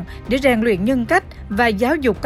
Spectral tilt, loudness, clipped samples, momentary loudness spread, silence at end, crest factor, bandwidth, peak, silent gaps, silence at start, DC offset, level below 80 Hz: -6 dB/octave; -18 LUFS; under 0.1%; 4 LU; 0 s; 14 dB; 15 kHz; -2 dBFS; none; 0 s; under 0.1%; -36 dBFS